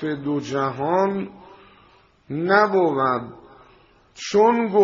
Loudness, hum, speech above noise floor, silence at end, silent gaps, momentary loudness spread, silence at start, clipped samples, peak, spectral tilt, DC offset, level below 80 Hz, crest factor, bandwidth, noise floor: -21 LUFS; none; 35 dB; 0 s; none; 15 LU; 0 s; under 0.1%; -4 dBFS; -4.5 dB/octave; under 0.1%; -62 dBFS; 18 dB; 7.4 kHz; -55 dBFS